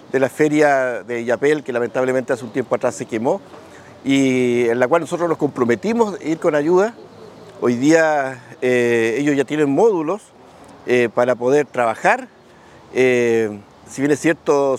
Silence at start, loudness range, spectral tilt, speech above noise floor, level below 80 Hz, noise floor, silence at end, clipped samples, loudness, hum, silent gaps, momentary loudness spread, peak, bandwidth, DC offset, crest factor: 0.15 s; 2 LU; -5.5 dB/octave; 28 dB; -66 dBFS; -45 dBFS; 0 s; under 0.1%; -18 LUFS; none; none; 8 LU; 0 dBFS; 14.5 kHz; under 0.1%; 18 dB